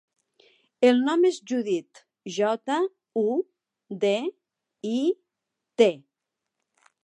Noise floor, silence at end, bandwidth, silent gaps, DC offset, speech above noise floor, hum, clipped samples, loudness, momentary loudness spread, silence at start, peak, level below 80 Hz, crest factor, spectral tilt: -85 dBFS; 1.05 s; 11 kHz; none; under 0.1%; 61 dB; none; under 0.1%; -25 LUFS; 16 LU; 0.8 s; -6 dBFS; -84 dBFS; 22 dB; -5 dB/octave